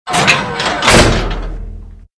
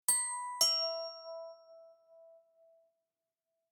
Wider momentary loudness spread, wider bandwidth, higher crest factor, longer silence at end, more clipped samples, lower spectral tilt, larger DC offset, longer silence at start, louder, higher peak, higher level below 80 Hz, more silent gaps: about the same, 20 LU vs 19 LU; second, 11 kHz vs 19.5 kHz; second, 14 dB vs 26 dB; second, 0.2 s vs 1.35 s; first, 0.4% vs under 0.1%; first, -3.5 dB/octave vs 3 dB/octave; neither; about the same, 0.05 s vs 0.1 s; first, -11 LUFS vs -31 LUFS; first, 0 dBFS vs -14 dBFS; first, -22 dBFS vs under -90 dBFS; neither